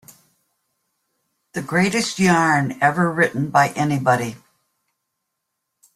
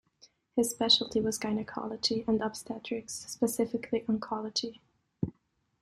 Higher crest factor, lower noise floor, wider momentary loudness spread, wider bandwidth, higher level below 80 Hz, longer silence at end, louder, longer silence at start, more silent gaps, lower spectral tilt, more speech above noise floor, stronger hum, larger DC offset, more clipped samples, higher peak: about the same, 20 dB vs 20 dB; first, -78 dBFS vs -74 dBFS; second, 6 LU vs 14 LU; about the same, 15 kHz vs 16 kHz; first, -58 dBFS vs -64 dBFS; first, 1.6 s vs 0.5 s; first, -18 LUFS vs -31 LUFS; first, 1.55 s vs 0.55 s; neither; first, -5 dB/octave vs -3.5 dB/octave; first, 59 dB vs 42 dB; neither; neither; neither; first, -2 dBFS vs -12 dBFS